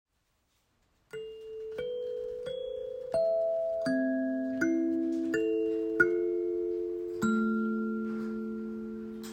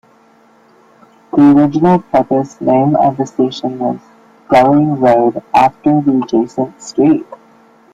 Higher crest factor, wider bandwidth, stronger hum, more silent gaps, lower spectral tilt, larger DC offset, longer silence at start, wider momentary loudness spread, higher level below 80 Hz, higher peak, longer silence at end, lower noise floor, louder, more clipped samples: first, 22 dB vs 12 dB; first, 15.5 kHz vs 7.8 kHz; neither; neither; about the same, -6.5 dB/octave vs -7.5 dB/octave; neither; second, 1.15 s vs 1.35 s; about the same, 12 LU vs 10 LU; second, -66 dBFS vs -50 dBFS; second, -10 dBFS vs 0 dBFS; second, 0 s vs 0.6 s; first, -75 dBFS vs -48 dBFS; second, -32 LUFS vs -12 LUFS; neither